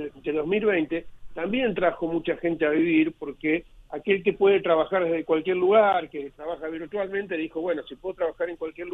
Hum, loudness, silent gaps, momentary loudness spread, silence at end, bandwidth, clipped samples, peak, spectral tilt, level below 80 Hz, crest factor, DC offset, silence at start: none; -25 LUFS; none; 13 LU; 0 s; 4 kHz; under 0.1%; -8 dBFS; -8 dB/octave; -56 dBFS; 18 dB; under 0.1%; 0 s